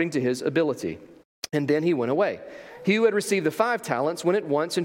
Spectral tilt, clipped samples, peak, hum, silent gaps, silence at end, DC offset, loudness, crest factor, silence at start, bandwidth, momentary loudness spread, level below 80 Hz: -5.5 dB/octave; under 0.1%; -8 dBFS; none; 1.25-1.42 s; 0 s; under 0.1%; -25 LUFS; 18 dB; 0 s; 16.5 kHz; 12 LU; -70 dBFS